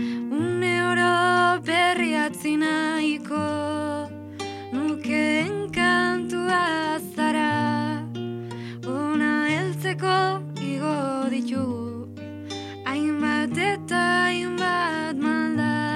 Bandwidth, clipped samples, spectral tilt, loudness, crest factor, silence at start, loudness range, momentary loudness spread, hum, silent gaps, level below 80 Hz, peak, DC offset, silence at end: 14.5 kHz; under 0.1%; -5 dB/octave; -24 LUFS; 16 dB; 0 s; 5 LU; 12 LU; none; none; -66 dBFS; -8 dBFS; under 0.1%; 0 s